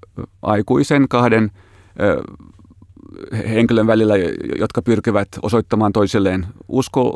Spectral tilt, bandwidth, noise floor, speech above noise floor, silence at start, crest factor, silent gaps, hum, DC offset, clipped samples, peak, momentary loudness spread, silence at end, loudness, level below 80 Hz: -7 dB/octave; 12 kHz; -44 dBFS; 27 dB; 0.15 s; 16 dB; none; none; under 0.1%; under 0.1%; 0 dBFS; 11 LU; 0 s; -17 LUFS; -46 dBFS